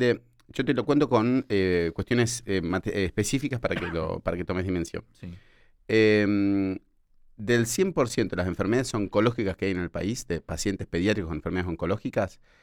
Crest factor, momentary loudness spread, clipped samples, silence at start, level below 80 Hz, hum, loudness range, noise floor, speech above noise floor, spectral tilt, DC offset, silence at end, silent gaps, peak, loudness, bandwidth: 18 dB; 9 LU; under 0.1%; 0 s; -48 dBFS; none; 4 LU; -57 dBFS; 31 dB; -5.5 dB/octave; under 0.1%; 0.35 s; none; -8 dBFS; -26 LUFS; 18.5 kHz